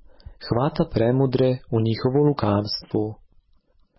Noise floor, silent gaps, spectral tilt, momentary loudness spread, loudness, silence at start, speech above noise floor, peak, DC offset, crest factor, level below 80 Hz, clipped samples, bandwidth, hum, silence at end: -59 dBFS; none; -10.5 dB/octave; 7 LU; -22 LUFS; 0.3 s; 38 dB; -8 dBFS; under 0.1%; 14 dB; -46 dBFS; under 0.1%; 5.8 kHz; none; 0.85 s